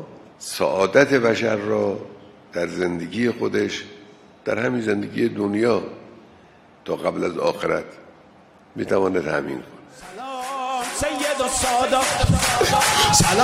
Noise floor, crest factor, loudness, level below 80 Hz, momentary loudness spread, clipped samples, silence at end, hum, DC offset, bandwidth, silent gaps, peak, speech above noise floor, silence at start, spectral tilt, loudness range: -50 dBFS; 22 dB; -21 LUFS; -42 dBFS; 18 LU; under 0.1%; 0 s; none; under 0.1%; 16 kHz; none; 0 dBFS; 30 dB; 0 s; -3.5 dB/octave; 5 LU